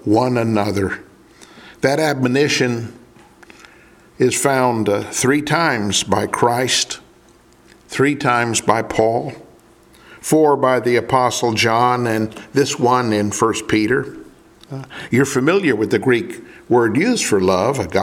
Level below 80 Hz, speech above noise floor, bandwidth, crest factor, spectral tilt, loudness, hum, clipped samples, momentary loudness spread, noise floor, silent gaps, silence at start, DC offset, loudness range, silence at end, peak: -52 dBFS; 33 dB; 17 kHz; 18 dB; -4.5 dB/octave; -17 LUFS; none; under 0.1%; 9 LU; -49 dBFS; none; 0.05 s; under 0.1%; 3 LU; 0 s; 0 dBFS